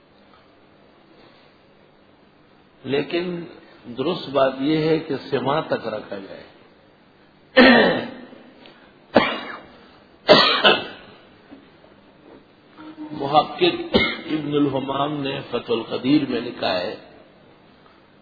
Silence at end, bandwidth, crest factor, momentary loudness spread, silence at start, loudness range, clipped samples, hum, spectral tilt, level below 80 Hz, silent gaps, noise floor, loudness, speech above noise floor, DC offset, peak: 1.2 s; 5 kHz; 22 dB; 21 LU; 2.85 s; 7 LU; under 0.1%; 50 Hz at -55 dBFS; -6.5 dB/octave; -54 dBFS; none; -53 dBFS; -20 LUFS; 30 dB; under 0.1%; 0 dBFS